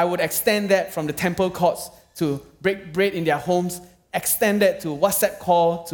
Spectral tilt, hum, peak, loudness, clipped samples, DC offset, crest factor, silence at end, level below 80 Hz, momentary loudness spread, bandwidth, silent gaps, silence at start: -4 dB/octave; none; -4 dBFS; -22 LUFS; under 0.1%; under 0.1%; 18 dB; 0 s; -56 dBFS; 8 LU; 18 kHz; none; 0 s